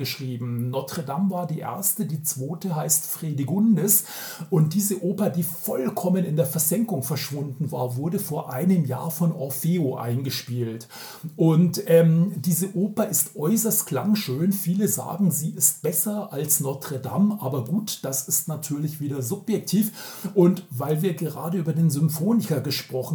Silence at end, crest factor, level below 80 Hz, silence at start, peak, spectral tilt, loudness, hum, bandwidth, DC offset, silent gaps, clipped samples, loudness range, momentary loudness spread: 0 s; 20 dB; -76 dBFS; 0 s; -4 dBFS; -5.5 dB/octave; -24 LUFS; none; over 20 kHz; under 0.1%; none; under 0.1%; 4 LU; 9 LU